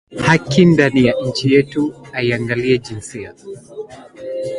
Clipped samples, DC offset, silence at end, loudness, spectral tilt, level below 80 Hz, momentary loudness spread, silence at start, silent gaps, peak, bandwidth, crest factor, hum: under 0.1%; under 0.1%; 0 s; -15 LUFS; -6 dB/octave; -48 dBFS; 21 LU; 0.1 s; none; 0 dBFS; 11.5 kHz; 16 dB; none